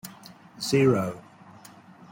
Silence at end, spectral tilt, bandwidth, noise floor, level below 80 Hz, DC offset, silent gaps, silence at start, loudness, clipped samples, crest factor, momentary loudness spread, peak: 0.9 s; -6 dB/octave; 16.5 kHz; -50 dBFS; -64 dBFS; under 0.1%; none; 0.05 s; -25 LUFS; under 0.1%; 20 dB; 26 LU; -8 dBFS